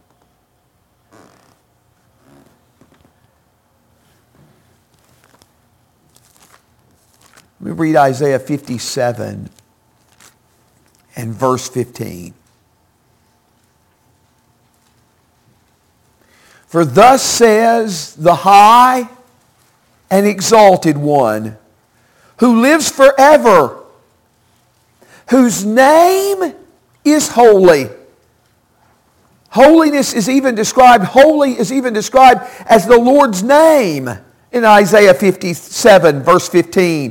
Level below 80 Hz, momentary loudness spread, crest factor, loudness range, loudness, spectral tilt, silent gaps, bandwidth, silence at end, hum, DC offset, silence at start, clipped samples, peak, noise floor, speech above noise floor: -50 dBFS; 15 LU; 12 dB; 14 LU; -10 LUFS; -4.5 dB/octave; none; 17 kHz; 0 s; none; under 0.1%; 7.6 s; under 0.1%; 0 dBFS; -58 dBFS; 48 dB